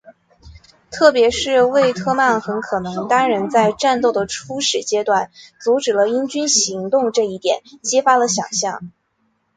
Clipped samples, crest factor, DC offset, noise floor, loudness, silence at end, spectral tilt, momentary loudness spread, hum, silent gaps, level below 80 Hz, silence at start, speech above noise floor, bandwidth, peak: under 0.1%; 18 dB; under 0.1%; -66 dBFS; -17 LUFS; 0.65 s; -2.5 dB/octave; 8 LU; none; none; -54 dBFS; 0.45 s; 49 dB; 9.6 kHz; 0 dBFS